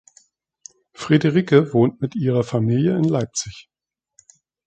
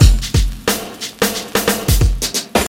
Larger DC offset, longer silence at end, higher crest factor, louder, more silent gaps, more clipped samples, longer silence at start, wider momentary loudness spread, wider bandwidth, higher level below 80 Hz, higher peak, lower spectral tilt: neither; first, 1.05 s vs 0 s; first, 20 dB vs 14 dB; about the same, -19 LUFS vs -17 LUFS; neither; neither; first, 1 s vs 0 s; first, 11 LU vs 4 LU; second, 9.2 kHz vs 17 kHz; second, -56 dBFS vs -18 dBFS; about the same, -2 dBFS vs 0 dBFS; first, -6.5 dB/octave vs -4 dB/octave